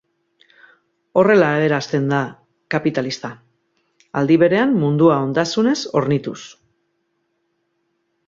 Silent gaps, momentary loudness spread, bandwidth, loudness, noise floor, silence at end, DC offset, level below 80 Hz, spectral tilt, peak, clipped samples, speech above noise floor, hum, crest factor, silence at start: none; 15 LU; 7.8 kHz; -18 LUFS; -70 dBFS; 1.8 s; under 0.1%; -60 dBFS; -6.5 dB/octave; -2 dBFS; under 0.1%; 53 dB; none; 18 dB; 1.15 s